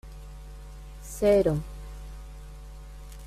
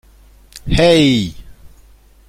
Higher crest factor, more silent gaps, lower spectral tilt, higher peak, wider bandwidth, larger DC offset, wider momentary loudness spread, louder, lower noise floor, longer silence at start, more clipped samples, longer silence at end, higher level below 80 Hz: about the same, 20 dB vs 16 dB; neither; about the same, -6.5 dB/octave vs -5.5 dB/octave; second, -12 dBFS vs 0 dBFS; about the same, 15 kHz vs 15 kHz; neither; first, 24 LU vs 17 LU; second, -24 LUFS vs -13 LUFS; second, -42 dBFS vs -46 dBFS; second, 0.05 s vs 0.65 s; neither; second, 0 s vs 0.6 s; second, -42 dBFS vs -32 dBFS